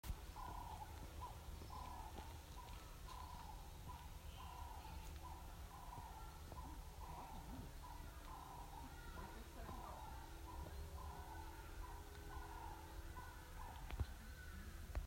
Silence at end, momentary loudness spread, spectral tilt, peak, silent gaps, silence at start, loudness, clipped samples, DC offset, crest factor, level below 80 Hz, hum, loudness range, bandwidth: 0 s; 3 LU; -4.5 dB/octave; -32 dBFS; none; 0.05 s; -55 LUFS; under 0.1%; under 0.1%; 20 dB; -56 dBFS; none; 1 LU; 16 kHz